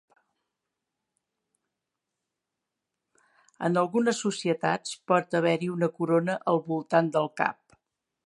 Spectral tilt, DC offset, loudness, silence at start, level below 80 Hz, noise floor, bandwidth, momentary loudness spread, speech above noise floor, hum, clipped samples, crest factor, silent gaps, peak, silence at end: -5.5 dB/octave; under 0.1%; -27 LUFS; 3.6 s; -80 dBFS; -86 dBFS; 11.5 kHz; 4 LU; 60 dB; none; under 0.1%; 22 dB; none; -6 dBFS; 0.75 s